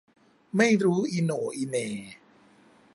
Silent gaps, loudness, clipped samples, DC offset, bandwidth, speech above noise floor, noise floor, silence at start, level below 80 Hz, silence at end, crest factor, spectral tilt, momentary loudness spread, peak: none; -26 LUFS; under 0.1%; under 0.1%; 11.5 kHz; 32 dB; -58 dBFS; 0.55 s; -72 dBFS; 0.8 s; 20 dB; -5.5 dB/octave; 14 LU; -8 dBFS